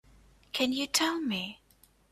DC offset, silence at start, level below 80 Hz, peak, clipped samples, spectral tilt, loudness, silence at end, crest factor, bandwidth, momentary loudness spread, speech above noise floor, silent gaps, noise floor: under 0.1%; 0.55 s; -64 dBFS; -10 dBFS; under 0.1%; -2 dB/octave; -30 LUFS; 0.55 s; 24 dB; 15.5 kHz; 10 LU; 34 dB; none; -64 dBFS